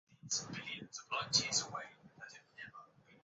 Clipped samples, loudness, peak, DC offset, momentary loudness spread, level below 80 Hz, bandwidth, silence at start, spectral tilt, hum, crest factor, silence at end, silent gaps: under 0.1%; -37 LUFS; -18 dBFS; under 0.1%; 22 LU; -74 dBFS; 7.6 kHz; 0.1 s; -0.5 dB/octave; none; 26 dB; 0.05 s; none